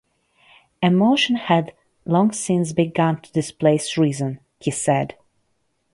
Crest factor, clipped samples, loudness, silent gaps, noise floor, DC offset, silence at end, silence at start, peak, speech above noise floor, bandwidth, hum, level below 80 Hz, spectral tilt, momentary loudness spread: 18 dB; under 0.1%; -20 LUFS; none; -69 dBFS; under 0.1%; 0.85 s; 0.8 s; -2 dBFS; 50 dB; 11.5 kHz; none; -60 dBFS; -5.5 dB/octave; 11 LU